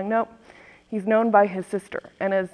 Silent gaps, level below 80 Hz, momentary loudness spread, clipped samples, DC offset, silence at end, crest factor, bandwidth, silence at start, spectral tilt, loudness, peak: none; -66 dBFS; 15 LU; under 0.1%; under 0.1%; 0.05 s; 20 dB; 11 kHz; 0 s; -7 dB/octave; -23 LUFS; -4 dBFS